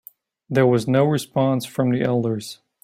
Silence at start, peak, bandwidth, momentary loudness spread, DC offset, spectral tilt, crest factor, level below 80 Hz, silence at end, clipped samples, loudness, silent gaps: 0.5 s; -6 dBFS; 16 kHz; 8 LU; under 0.1%; -7 dB/octave; 16 dB; -60 dBFS; 0.3 s; under 0.1%; -21 LUFS; none